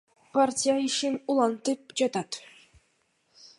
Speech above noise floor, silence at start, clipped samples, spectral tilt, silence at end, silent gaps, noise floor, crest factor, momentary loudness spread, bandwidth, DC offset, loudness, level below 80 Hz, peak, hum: 44 dB; 0.35 s; under 0.1%; -3 dB/octave; 0.15 s; none; -71 dBFS; 18 dB; 9 LU; 11.5 kHz; under 0.1%; -27 LUFS; -74 dBFS; -10 dBFS; none